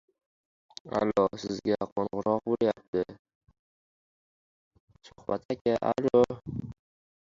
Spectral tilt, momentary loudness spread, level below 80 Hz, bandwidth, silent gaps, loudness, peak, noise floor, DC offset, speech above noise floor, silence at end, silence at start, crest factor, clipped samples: -7 dB/octave; 14 LU; -60 dBFS; 7.6 kHz; 1.92-1.96 s, 2.88-2.93 s, 3.19-3.25 s, 3.35-3.41 s, 3.59-4.71 s, 4.80-4.88 s, 5.45-5.49 s, 5.61-5.65 s; -29 LUFS; -10 dBFS; under -90 dBFS; under 0.1%; over 62 dB; 0.5 s; 0.85 s; 22 dB; under 0.1%